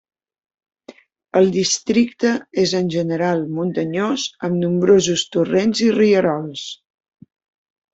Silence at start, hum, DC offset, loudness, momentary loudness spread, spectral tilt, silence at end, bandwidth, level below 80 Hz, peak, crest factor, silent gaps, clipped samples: 0.9 s; none; under 0.1%; -18 LUFS; 8 LU; -5 dB/octave; 1.2 s; 8 kHz; -60 dBFS; -2 dBFS; 16 dB; none; under 0.1%